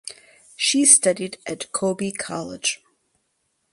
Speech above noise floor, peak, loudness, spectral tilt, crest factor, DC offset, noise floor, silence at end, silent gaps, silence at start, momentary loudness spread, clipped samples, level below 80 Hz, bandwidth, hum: 50 dB; 0 dBFS; -19 LUFS; -2 dB/octave; 24 dB; under 0.1%; -72 dBFS; 1 s; none; 0.05 s; 18 LU; under 0.1%; -66 dBFS; 11.5 kHz; none